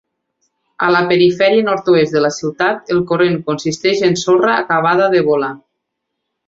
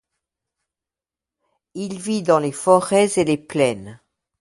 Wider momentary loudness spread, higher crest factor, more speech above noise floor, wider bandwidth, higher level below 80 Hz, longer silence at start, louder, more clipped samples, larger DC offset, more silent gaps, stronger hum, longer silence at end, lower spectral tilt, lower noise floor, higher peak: second, 6 LU vs 15 LU; second, 14 dB vs 22 dB; second, 62 dB vs 70 dB; second, 7.8 kHz vs 11.5 kHz; first, -56 dBFS vs -62 dBFS; second, 0.8 s vs 1.75 s; first, -14 LUFS vs -19 LUFS; neither; neither; neither; neither; first, 0.9 s vs 0.45 s; about the same, -5 dB/octave vs -5 dB/octave; second, -75 dBFS vs -89 dBFS; about the same, 0 dBFS vs 0 dBFS